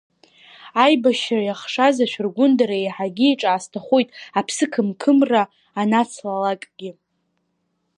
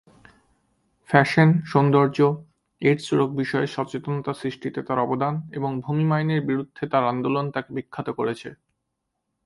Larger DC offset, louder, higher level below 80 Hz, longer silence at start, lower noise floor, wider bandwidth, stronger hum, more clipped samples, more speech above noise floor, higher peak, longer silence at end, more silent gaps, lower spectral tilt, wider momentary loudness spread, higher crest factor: neither; first, -19 LUFS vs -23 LUFS; second, -76 dBFS vs -62 dBFS; second, 0.65 s vs 1.1 s; second, -71 dBFS vs -79 dBFS; about the same, 11 kHz vs 11.5 kHz; neither; neither; second, 52 dB vs 57 dB; about the same, -2 dBFS vs 0 dBFS; first, 1.05 s vs 0.9 s; neither; second, -4.5 dB/octave vs -7.5 dB/octave; second, 9 LU vs 12 LU; second, 18 dB vs 24 dB